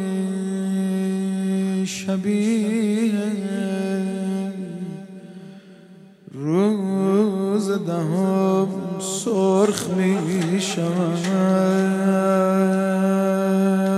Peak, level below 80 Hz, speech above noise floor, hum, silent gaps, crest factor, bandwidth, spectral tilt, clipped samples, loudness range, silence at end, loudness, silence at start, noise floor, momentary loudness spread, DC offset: -2 dBFS; -68 dBFS; 26 dB; none; none; 18 dB; 13 kHz; -6.5 dB/octave; under 0.1%; 6 LU; 0 s; -21 LUFS; 0 s; -46 dBFS; 8 LU; under 0.1%